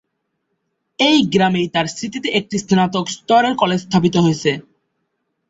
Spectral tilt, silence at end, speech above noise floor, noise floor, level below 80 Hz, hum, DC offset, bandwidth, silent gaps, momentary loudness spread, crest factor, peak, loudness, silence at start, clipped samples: -5 dB/octave; 0.9 s; 56 dB; -72 dBFS; -54 dBFS; none; under 0.1%; 8 kHz; none; 8 LU; 16 dB; -2 dBFS; -17 LUFS; 1 s; under 0.1%